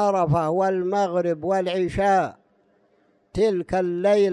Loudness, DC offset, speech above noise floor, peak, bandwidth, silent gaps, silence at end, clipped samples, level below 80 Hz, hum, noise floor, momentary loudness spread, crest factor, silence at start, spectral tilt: -22 LUFS; under 0.1%; 41 dB; -8 dBFS; 11.5 kHz; none; 0 s; under 0.1%; -48 dBFS; none; -63 dBFS; 4 LU; 14 dB; 0 s; -7 dB/octave